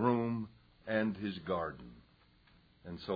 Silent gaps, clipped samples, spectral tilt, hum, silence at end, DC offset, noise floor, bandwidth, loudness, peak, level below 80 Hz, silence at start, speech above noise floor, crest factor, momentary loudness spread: none; under 0.1%; -5.5 dB/octave; none; 0 s; under 0.1%; -66 dBFS; 5 kHz; -37 LUFS; -18 dBFS; -66 dBFS; 0 s; 27 dB; 18 dB; 18 LU